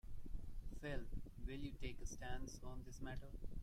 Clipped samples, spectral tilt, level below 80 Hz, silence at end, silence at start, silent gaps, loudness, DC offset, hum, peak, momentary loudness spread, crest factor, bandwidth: under 0.1%; -5 dB/octave; -50 dBFS; 0 s; 0.05 s; none; -53 LUFS; under 0.1%; none; -32 dBFS; 6 LU; 14 dB; 13.5 kHz